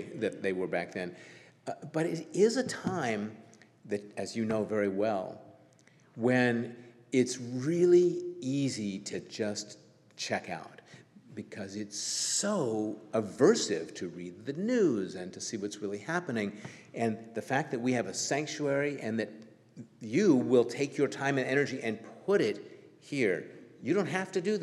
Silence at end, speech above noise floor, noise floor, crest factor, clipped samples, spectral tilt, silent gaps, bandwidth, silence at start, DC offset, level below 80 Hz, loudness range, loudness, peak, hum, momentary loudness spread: 0 s; 31 dB; -62 dBFS; 20 dB; under 0.1%; -4.5 dB/octave; none; 12.5 kHz; 0 s; under 0.1%; -80 dBFS; 5 LU; -31 LUFS; -12 dBFS; none; 16 LU